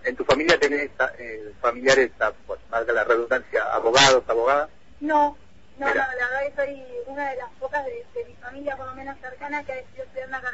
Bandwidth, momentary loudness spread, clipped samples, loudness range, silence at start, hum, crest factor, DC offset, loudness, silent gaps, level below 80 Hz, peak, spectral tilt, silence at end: 8 kHz; 17 LU; under 0.1%; 11 LU; 0.05 s; none; 22 dB; 0.5%; -23 LUFS; none; -54 dBFS; -2 dBFS; -2.5 dB/octave; 0 s